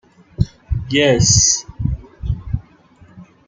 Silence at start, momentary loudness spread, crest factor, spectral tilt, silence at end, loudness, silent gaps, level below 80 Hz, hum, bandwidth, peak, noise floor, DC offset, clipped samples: 0.4 s; 16 LU; 18 dB; -3.5 dB/octave; 0.25 s; -16 LUFS; none; -30 dBFS; none; 10.5 kHz; 0 dBFS; -48 dBFS; under 0.1%; under 0.1%